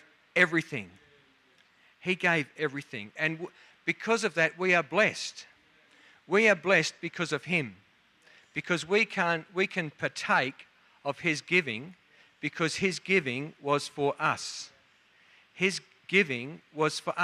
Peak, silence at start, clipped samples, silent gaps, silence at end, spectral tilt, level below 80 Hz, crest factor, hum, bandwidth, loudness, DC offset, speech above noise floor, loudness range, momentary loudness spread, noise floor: -8 dBFS; 0.35 s; under 0.1%; none; 0 s; -4 dB/octave; -76 dBFS; 22 dB; none; 13.5 kHz; -28 LUFS; under 0.1%; 35 dB; 4 LU; 14 LU; -64 dBFS